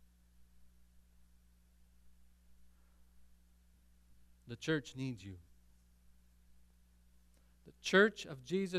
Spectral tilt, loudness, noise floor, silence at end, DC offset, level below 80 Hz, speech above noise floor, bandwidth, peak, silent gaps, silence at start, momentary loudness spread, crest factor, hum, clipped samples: -5 dB/octave; -35 LUFS; -67 dBFS; 0 s; under 0.1%; -68 dBFS; 31 dB; 14.5 kHz; -14 dBFS; none; 0.6 s; 21 LU; 28 dB; none; under 0.1%